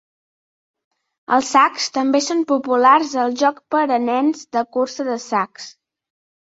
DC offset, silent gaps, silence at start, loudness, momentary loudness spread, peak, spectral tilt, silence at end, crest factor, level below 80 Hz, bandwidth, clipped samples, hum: under 0.1%; none; 1.3 s; -18 LUFS; 9 LU; -2 dBFS; -2.5 dB/octave; 0.75 s; 18 dB; -68 dBFS; 8 kHz; under 0.1%; none